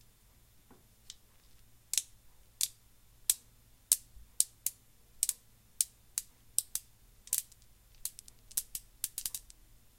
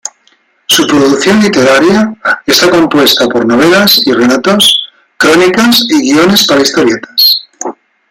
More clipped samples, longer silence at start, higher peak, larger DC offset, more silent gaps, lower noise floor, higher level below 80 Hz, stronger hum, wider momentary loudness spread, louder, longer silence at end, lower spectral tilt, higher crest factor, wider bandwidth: second, under 0.1% vs 0.2%; first, 1.1 s vs 0.05 s; about the same, 0 dBFS vs 0 dBFS; neither; neither; first, -63 dBFS vs -50 dBFS; second, -64 dBFS vs -46 dBFS; neither; first, 20 LU vs 6 LU; second, -35 LUFS vs -6 LUFS; first, 0.55 s vs 0.4 s; second, 2 dB/octave vs -3 dB/octave; first, 40 dB vs 8 dB; second, 16.5 kHz vs over 20 kHz